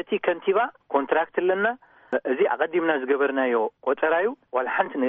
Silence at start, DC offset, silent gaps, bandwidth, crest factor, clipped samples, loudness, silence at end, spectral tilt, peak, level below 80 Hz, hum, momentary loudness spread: 0 s; under 0.1%; none; 3.8 kHz; 16 dB; under 0.1%; -24 LUFS; 0 s; -2.5 dB/octave; -6 dBFS; -76 dBFS; none; 4 LU